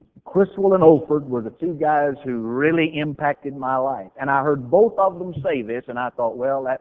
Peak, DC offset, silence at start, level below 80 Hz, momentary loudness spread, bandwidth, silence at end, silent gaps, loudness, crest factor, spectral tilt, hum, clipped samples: 0 dBFS; under 0.1%; 0.25 s; -58 dBFS; 12 LU; 3.8 kHz; 0.05 s; none; -20 LUFS; 20 dB; -9.5 dB/octave; none; under 0.1%